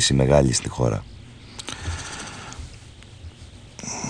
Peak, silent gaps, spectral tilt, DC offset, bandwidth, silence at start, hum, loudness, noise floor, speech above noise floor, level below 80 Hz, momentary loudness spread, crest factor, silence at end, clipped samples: -4 dBFS; none; -4.5 dB/octave; under 0.1%; 10.5 kHz; 0 s; none; -23 LUFS; -43 dBFS; 24 dB; -38 dBFS; 26 LU; 22 dB; 0 s; under 0.1%